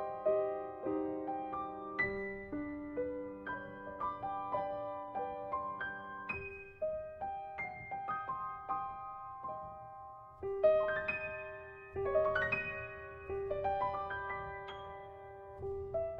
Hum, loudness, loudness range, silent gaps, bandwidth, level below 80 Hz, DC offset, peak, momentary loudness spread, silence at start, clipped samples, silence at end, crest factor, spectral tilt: none; -39 LUFS; 6 LU; none; 5.4 kHz; -62 dBFS; under 0.1%; -18 dBFS; 13 LU; 0 s; under 0.1%; 0 s; 20 dB; -8 dB/octave